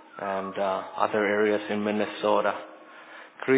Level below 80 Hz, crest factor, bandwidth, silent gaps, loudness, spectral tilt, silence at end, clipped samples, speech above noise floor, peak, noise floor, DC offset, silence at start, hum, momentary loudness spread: -72 dBFS; 20 dB; 4 kHz; none; -27 LUFS; -9 dB/octave; 0 s; under 0.1%; 20 dB; -6 dBFS; -47 dBFS; under 0.1%; 0.15 s; none; 21 LU